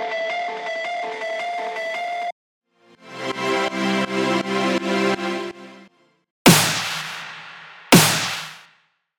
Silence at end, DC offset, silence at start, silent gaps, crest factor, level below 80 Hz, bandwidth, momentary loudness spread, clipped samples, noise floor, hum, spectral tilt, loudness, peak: 0.55 s; under 0.1%; 0 s; 2.32-2.61 s, 6.31-6.45 s; 22 dB; -56 dBFS; over 20 kHz; 20 LU; under 0.1%; -61 dBFS; none; -3.5 dB/octave; -20 LUFS; 0 dBFS